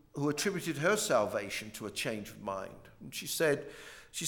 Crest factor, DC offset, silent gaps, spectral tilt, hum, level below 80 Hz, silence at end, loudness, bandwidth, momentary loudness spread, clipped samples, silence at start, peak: 20 dB; under 0.1%; none; -3.5 dB/octave; none; -66 dBFS; 0 s; -34 LUFS; 19 kHz; 14 LU; under 0.1%; 0.15 s; -16 dBFS